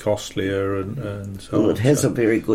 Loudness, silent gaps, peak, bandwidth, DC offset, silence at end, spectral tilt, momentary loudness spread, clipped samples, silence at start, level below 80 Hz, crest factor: -21 LUFS; none; -4 dBFS; 16 kHz; under 0.1%; 0 s; -6 dB/octave; 11 LU; under 0.1%; 0 s; -48 dBFS; 16 dB